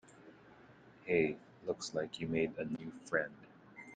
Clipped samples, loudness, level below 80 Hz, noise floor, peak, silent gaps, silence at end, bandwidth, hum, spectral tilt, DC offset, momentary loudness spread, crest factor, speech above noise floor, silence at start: under 0.1%; -38 LUFS; -72 dBFS; -60 dBFS; -18 dBFS; none; 0 s; 9.4 kHz; none; -5 dB/octave; under 0.1%; 25 LU; 22 dB; 23 dB; 0.1 s